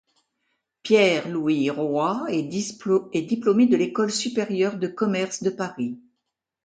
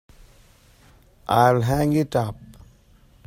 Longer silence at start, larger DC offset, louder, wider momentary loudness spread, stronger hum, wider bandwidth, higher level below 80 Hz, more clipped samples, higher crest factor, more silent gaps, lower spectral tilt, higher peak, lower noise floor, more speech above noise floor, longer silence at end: second, 0.85 s vs 1.3 s; neither; about the same, -23 LUFS vs -21 LUFS; second, 10 LU vs 19 LU; neither; second, 9.4 kHz vs 16 kHz; second, -70 dBFS vs -46 dBFS; neither; about the same, 18 dB vs 20 dB; neither; second, -5 dB/octave vs -7 dB/octave; about the same, -4 dBFS vs -4 dBFS; first, -81 dBFS vs -54 dBFS; first, 58 dB vs 34 dB; second, 0.65 s vs 0.8 s